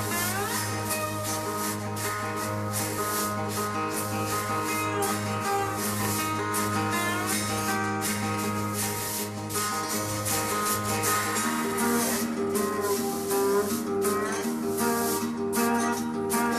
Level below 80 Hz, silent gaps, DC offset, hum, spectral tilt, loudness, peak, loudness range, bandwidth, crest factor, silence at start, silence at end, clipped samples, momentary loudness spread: -58 dBFS; none; under 0.1%; none; -3.5 dB/octave; -27 LUFS; -12 dBFS; 3 LU; 14 kHz; 16 dB; 0 s; 0 s; under 0.1%; 4 LU